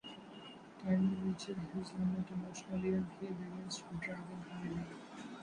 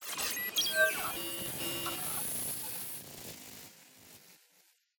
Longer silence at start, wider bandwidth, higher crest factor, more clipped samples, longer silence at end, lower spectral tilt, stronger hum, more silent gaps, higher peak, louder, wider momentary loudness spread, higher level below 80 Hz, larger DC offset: about the same, 0.05 s vs 0 s; second, 10.5 kHz vs 18 kHz; second, 16 dB vs 22 dB; neither; second, 0 s vs 0.65 s; first, -6.5 dB/octave vs -0.5 dB/octave; neither; neither; second, -24 dBFS vs -16 dBFS; second, -41 LUFS vs -33 LUFS; second, 15 LU vs 21 LU; about the same, -66 dBFS vs -68 dBFS; neither